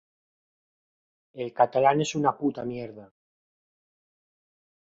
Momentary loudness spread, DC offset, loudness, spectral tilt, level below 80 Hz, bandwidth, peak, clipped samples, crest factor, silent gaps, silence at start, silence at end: 16 LU; under 0.1%; -25 LUFS; -5.5 dB/octave; -70 dBFS; 8 kHz; -8 dBFS; under 0.1%; 22 dB; none; 1.35 s; 1.8 s